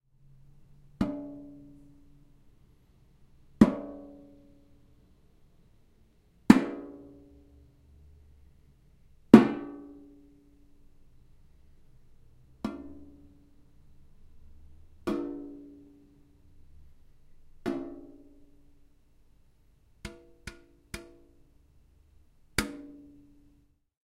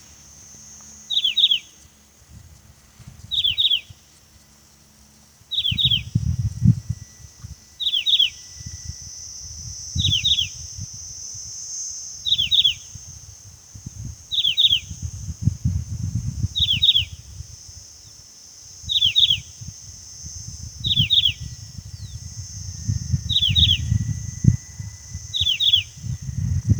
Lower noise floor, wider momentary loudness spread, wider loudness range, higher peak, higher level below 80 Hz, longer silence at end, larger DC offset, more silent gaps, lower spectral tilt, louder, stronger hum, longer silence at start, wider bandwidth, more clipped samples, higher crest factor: first, -65 dBFS vs -52 dBFS; first, 29 LU vs 23 LU; first, 21 LU vs 4 LU; about the same, 0 dBFS vs 0 dBFS; second, -54 dBFS vs -38 dBFS; first, 1.25 s vs 0 s; neither; neither; first, -6.5 dB/octave vs -2.5 dB/octave; second, -26 LUFS vs -19 LUFS; neither; first, 1 s vs 0.1 s; second, 15.5 kHz vs over 20 kHz; neither; first, 32 dB vs 24 dB